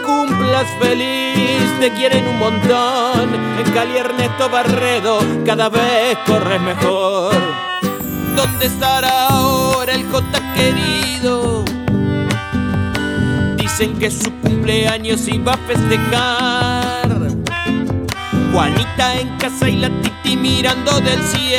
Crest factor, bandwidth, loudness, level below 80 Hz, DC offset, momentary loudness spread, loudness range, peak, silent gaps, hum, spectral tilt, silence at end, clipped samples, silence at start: 14 dB; over 20 kHz; -15 LUFS; -38 dBFS; under 0.1%; 4 LU; 2 LU; -2 dBFS; none; none; -4.5 dB/octave; 0 s; under 0.1%; 0 s